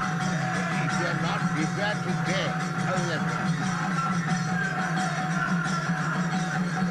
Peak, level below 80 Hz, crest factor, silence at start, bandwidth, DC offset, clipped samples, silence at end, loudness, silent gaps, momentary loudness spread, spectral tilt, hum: -14 dBFS; -56 dBFS; 14 dB; 0 s; 12 kHz; under 0.1%; under 0.1%; 0 s; -27 LUFS; none; 1 LU; -5.5 dB/octave; none